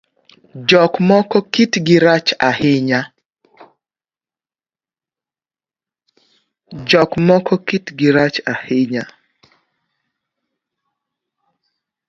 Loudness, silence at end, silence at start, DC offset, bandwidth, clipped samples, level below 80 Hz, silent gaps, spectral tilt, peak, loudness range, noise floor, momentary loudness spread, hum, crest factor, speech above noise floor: -14 LUFS; 3.05 s; 0.55 s; under 0.1%; 7.6 kHz; under 0.1%; -56 dBFS; 3.25-3.29 s; -5.5 dB/octave; 0 dBFS; 11 LU; under -90 dBFS; 10 LU; none; 18 dB; over 76 dB